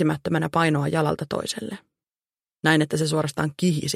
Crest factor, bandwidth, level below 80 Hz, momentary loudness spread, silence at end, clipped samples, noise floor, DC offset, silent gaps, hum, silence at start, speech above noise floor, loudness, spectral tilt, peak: 20 dB; 14.5 kHz; -58 dBFS; 9 LU; 0 s; under 0.1%; under -90 dBFS; under 0.1%; none; none; 0 s; over 67 dB; -23 LUFS; -5.5 dB/octave; -4 dBFS